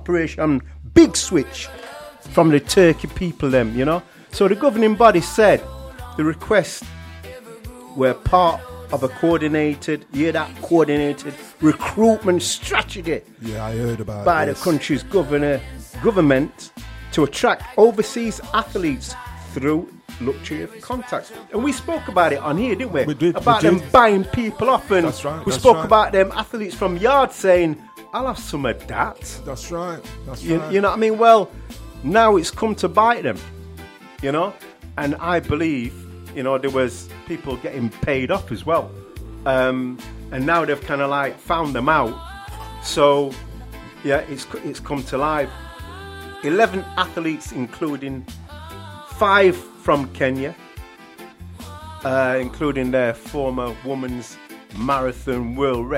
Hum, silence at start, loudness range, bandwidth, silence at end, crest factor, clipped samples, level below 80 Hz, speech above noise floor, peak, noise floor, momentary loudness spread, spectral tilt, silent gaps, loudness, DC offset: none; 0 s; 7 LU; 16 kHz; 0 s; 20 dB; under 0.1%; -40 dBFS; 23 dB; 0 dBFS; -42 dBFS; 20 LU; -5.5 dB/octave; none; -19 LUFS; under 0.1%